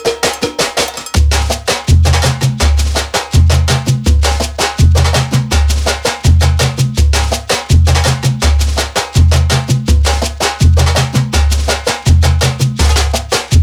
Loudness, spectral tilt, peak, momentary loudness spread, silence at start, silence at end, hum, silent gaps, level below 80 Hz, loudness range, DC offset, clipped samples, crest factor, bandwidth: -12 LUFS; -4.5 dB/octave; 0 dBFS; 4 LU; 0 s; 0 s; none; none; -14 dBFS; 0 LU; under 0.1%; under 0.1%; 10 dB; 15.5 kHz